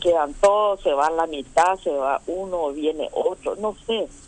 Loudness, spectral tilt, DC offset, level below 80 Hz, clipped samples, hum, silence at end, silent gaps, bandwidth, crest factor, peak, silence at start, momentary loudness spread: -22 LUFS; -3.5 dB/octave; under 0.1%; -48 dBFS; under 0.1%; none; 0 s; none; 10.5 kHz; 16 dB; -6 dBFS; 0 s; 8 LU